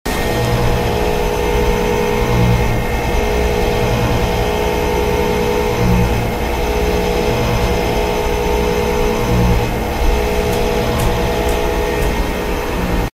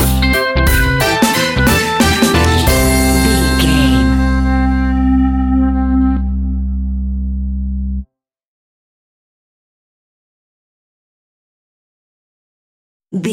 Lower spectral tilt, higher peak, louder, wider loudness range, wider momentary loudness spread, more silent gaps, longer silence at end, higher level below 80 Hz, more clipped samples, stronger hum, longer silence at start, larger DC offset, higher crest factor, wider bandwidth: about the same, -5.5 dB/octave vs -5 dB/octave; about the same, -2 dBFS vs 0 dBFS; second, -16 LUFS vs -13 LUFS; second, 1 LU vs 15 LU; second, 3 LU vs 9 LU; second, none vs 8.48-13.00 s; about the same, 0.05 s vs 0 s; about the same, -20 dBFS vs -20 dBFS; neither; neither; about the same, 0.05 s vs 0 s; neither; about the same, 14 dB vs 14 dB; about the same, 16 kHz vs 17 kHz